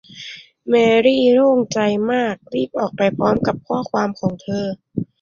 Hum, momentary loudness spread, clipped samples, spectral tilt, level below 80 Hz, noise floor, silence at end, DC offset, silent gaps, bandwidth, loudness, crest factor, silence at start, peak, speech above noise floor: none; 14 LU; under 0.1%; -6 dB/octave; -52 dBFS; -37 dBFS; 0.2 s; under 0.1%; none; 7.4 kHz; -18 LUFS; 16 dB; 0.15 s; -2 dBFS; 20 dB